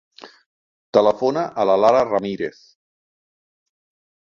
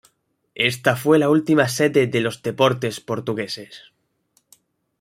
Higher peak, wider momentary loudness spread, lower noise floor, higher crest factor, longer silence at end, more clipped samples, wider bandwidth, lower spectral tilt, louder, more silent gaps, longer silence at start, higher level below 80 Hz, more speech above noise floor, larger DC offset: about the same, -2 dBFS vs -2 dBFS; about the same, 12 LU vs 10 LU; first, under -90 dBFS vs -67 dBFS; about the same, 20 dB vs 20 dB; first, 1.7 s vs 1.25 s; neither; second, 7.4 kHz vs 16 kHz; about the same, -6 dB/octave vs -5 dB/octave; about the same, -19 LUFS vs -20 LUFS; first, 0.46-0.93 s vs none; second, 0.25 s vs 0.55 s; about the same, -62 dBFS vs -62 dBFS; first, over 72 dB vs 47 dB; neither